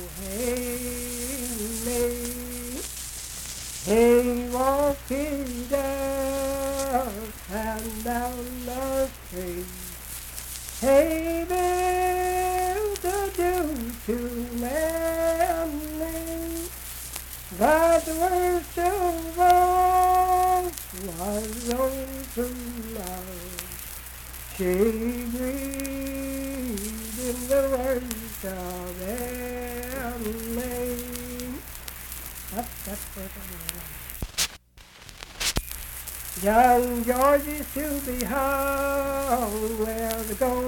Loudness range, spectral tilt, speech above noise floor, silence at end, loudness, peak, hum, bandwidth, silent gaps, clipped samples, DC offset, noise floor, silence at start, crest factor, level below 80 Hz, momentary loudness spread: 9 LU; -4 dB/octave; 25 dB; 0 s; -26 LUFS; -2 dBFS; none; 19 kHz; none; under 0.1%; under 0.1%; -50 dBFS; 0 s; 24 dB; -40 dBFS; 14 LU